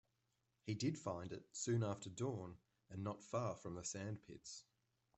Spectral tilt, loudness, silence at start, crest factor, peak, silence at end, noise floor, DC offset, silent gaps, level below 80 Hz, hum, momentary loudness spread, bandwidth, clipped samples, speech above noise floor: -5.5 dB/octave; -46 LUFS; 0.65 s; 18 dB; -28 dBFS; 0.55 s; -86 dBFS; under 0.1%; none; -78 dBFS; none; 14 LU; 8.2 kHz; under 0.1%; 40 dB